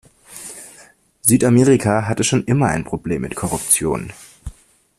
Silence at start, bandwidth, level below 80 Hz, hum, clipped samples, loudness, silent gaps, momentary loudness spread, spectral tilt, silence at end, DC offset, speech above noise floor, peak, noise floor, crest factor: 0.3 s; 15.5 kHz; -44 dBFS; none; under 0.1%; -17 LUFS; none; 23 LU; -5 dB/octave; 0.45 s; under 0.1%; 32 dB; 0 dBFS; -48 dBFS; 18 dB